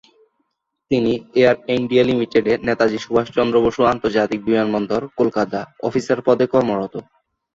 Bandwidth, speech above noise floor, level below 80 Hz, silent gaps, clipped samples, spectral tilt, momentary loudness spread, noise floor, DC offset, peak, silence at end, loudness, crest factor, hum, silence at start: 7.8 kHz; 54 dB; -50 dBFS; none; under 0.1%; -6.5 dB/octave; 7 LU; -72 dBFS; under 0.1%; -2 dBFS; 0.55 s; -18 LUFS; 16 dB; none; 0.9 s